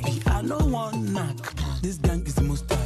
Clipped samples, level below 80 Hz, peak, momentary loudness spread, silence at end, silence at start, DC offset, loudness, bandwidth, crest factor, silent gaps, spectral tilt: under 0.1%; -30 dBFS; -10 dBFS; 5 LU; 0 s; 0 s; under 0.1%; -26 LUFS; 13.5 kHz; 14 dB; none; -6 dB/octave